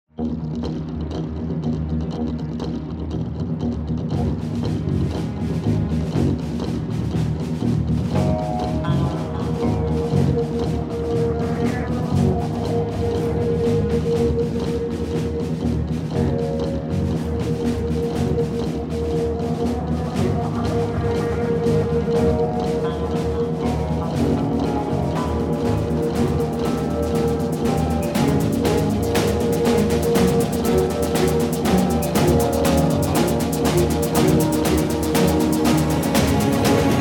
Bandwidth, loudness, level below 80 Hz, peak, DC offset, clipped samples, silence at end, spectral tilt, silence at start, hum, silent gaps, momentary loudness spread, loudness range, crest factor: 17.5 kHz; -21 LUFS; -32 dBFS; -4 dBFS; under 0.1%; under 0.1%; 0 s; -6.5 dB/octave; 0.2 s; none; none; 7 LU; 5 LU; 16 dB